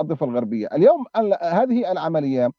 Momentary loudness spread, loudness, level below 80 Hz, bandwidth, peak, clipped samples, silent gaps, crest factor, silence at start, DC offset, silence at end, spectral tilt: 7 LU; -20 LUFS; -72 dBFS; 6.6 kHz; -4 dBFS; under 0.1%; none; 16 dB; 0 s; under 0.1%; 0.05 s; -9 dB/octave